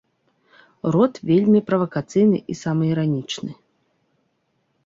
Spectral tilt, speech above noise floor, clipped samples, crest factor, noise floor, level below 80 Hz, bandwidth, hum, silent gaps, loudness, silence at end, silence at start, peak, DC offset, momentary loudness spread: -7.5 dB/octave; 50 dB; under 0.1%; 18 dB; -69 dBFS; -60 dBFS; 7.8 kHz; none; none; -20 LUFS; 1.35 s; 0.85 s; -4 dBFS; under 0.1%; 12 LU